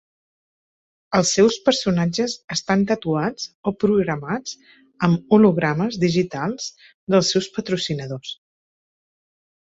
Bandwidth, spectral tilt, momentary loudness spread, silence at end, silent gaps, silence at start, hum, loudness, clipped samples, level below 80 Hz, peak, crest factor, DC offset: 8.2 kHz; -5 dB/octave; 14 LU; 1.3 s; 2.44-2.48 s, 3.55-3.63 s, 6.94-7.07 s; 1.1 s; none; -20 LUFS; under 0.1%; -56 dBFS; -2 dBFS; 18 dB; under 0.1%